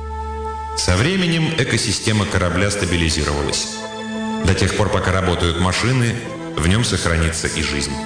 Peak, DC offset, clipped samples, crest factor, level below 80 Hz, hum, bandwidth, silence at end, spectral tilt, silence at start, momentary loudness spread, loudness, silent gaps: -6 dBFS; under 0.1%; under 0.1%; 12 dB; -32 dBFS; none; 10 kHz; 0 s; -4.5 dB/octave; 0 s; 9 LU; -18 LUFS; none